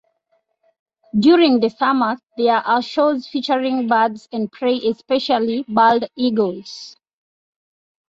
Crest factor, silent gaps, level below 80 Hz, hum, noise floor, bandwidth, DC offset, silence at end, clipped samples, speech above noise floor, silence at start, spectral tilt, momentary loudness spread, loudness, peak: 16 dB; none; -64 dBFS; none; -67 dBFS; 7.8 kHz; under 0.1%; 1.2 s; under 0.1%; 50 dB; 1.15 s; -6 dB/octave; 10 LU; -18 LUFS; -2 dBFS